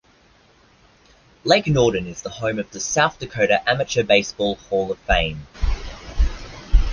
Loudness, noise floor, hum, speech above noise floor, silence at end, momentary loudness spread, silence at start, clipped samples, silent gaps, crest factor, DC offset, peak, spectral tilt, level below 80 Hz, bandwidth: -21 LUFS; -55 dBFS; none; 34 dB; 0 s; 11 LU; 1.45 s; under 0.1%; none; 20 dB; under 0.1%; -2 dBFS; -4 dB/octave; -26 dBFS; 10 kHz